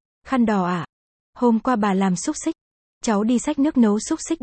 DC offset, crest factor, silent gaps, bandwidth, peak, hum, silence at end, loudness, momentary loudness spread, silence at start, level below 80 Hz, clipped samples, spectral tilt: under 0.1%; 14 dB; 0.89-1.33 s, 2.61-3.01 s; 8.8 kHz; -6 dBFS; none; 0.05 s; -21 LUFS; 10 LU; 0.25 s; -54 dBFS; under 0.1%; -5.5 dB/octave